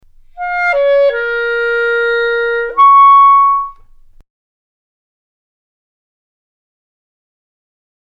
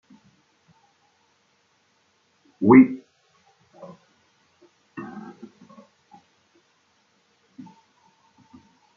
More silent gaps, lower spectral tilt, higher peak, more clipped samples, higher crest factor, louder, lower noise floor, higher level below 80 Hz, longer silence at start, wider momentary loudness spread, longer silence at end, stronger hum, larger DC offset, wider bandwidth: neither; second, -2 dB/octave vs -8.5 dB/octave; about the same, 0 dBFS vs -2 dBFS; neither; second, 14 dB vs 24 dB; first, -10 LUFS vs -16 LUFS; second, -41 dBFS vs -66 dBFS; first, -46 dBFS vs -70 dBFS; second, 0.35 s vs 2.6 s; second, 12 LU vs 33 LU; first, 4.35 s vs 3.75 s; neither; neither; first, 5.4 kHz vs 3.4 kHz